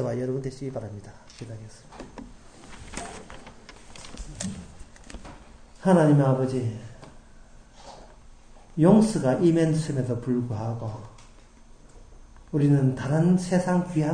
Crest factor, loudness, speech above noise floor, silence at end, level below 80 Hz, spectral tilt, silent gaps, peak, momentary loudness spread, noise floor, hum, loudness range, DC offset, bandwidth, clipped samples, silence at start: 22 dB; -24 LUFS; 26 dB; 0 s; -48 dBFS; -7.5 dB/octave; none; -4 dBFS; 26 LU; -50 dBFS; none; 16 LU; under 0.1%; 9.8 kHz; under 0.1%; 0 s